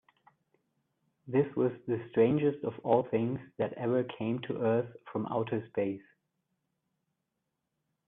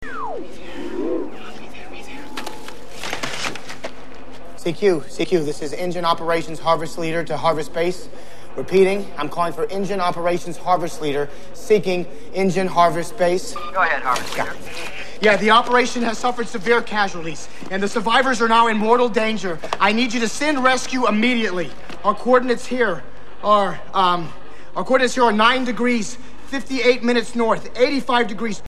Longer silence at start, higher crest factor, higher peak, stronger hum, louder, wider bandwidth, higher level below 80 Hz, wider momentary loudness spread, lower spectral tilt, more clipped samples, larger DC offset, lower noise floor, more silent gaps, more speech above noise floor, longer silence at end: first, 1.25 s vs 0 s; about the same, 20 dB vs 18 dB; second, -12 dBFS vs -2 dBFS; neither; second, -32 LUFS vs -20 LUFS; second, 3.9 kHz vs 14 kHz; second, -72 dBFS vs -50 dBFS; second, 9 LU vs 17 LU; first, -11 dB/octave vs -4 dB/octave; neither; second, under 0.1% vs 6%; first, -84 dBFS vs -39 dBFS; neither; first, 54 dB vs 20 dB; first, 2.1 s vs 0.05 s